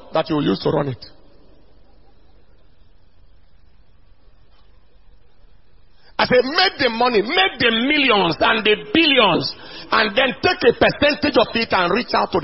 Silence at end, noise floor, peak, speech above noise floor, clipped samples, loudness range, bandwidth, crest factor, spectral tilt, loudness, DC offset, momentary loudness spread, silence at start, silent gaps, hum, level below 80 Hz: 0 s; -53 dBFS; 0 dBFS; 35 dB; under 0.1%; 11 LU; 6 kHz; 20 dB; -7.5 dB/octave; -17 LUFS; 0.6%; 7 LU; 0.1 s; none; none; -48 dBFS